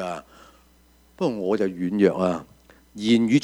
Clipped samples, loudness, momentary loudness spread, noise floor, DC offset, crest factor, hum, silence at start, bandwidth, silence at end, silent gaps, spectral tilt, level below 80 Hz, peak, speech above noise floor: under 0.1%; -23 LUFS; 12 LU; -57 dBFS; under 0.1%; 20 dB; none; 0 s; 11 kHz; 0 s; none; -6.5 dB/octave; -58 dBFS; -4 dBFS; 35 dB